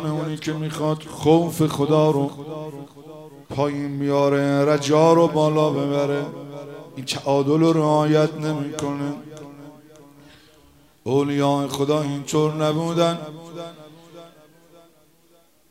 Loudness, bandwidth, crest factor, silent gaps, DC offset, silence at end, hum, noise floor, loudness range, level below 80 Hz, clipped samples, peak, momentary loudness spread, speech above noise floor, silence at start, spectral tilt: -21 LUFS; 16 kHz; 18 dB; none; under 0.1%; 1.45 s; none; -58 dBFS; 6 LU; -62 dBFS; under 0.1%; -4 dBFS; 19 LU; 38 dB; 0 s; -6.5 dB/octave